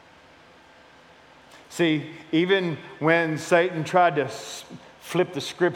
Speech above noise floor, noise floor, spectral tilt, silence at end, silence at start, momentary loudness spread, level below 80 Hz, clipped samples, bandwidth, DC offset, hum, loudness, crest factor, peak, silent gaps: 28 dB; -52 dBFS; -5 dB/octave; 0 s; 1.55 s; 16 LU; -72 dBFS; under 0.1%; 16.5 kHz; under 0.1%; none; -23 LUFS; 20 dB; -4 dBFS; none